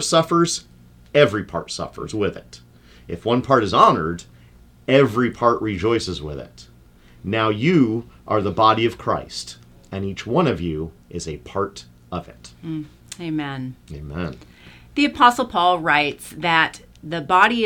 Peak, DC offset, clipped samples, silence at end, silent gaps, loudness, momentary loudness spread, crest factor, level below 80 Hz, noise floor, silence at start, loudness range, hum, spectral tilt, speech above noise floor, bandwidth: -2 dBFS; under 0.1%; under 0.1%; 0 s; none; -20 LUFS; 17 LU; 20 dB; -48 dBFS; -49 dBFS; 0 s; 10 LU; none; -5 dB/octave; 29 dB; 17 kHz